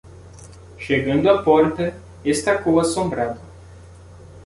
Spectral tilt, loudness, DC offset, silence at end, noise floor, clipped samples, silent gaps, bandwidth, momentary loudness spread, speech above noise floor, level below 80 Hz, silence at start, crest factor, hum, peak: -5.5 dB/octave; -19 LUFS; under 0.1%; 0 s; -42 dBFS; under 0.1%; none; 11.5 kHz; 11 LU; 24 dB; -46 dBFS; 0.05 s; 18 dB; none; -2 dBFS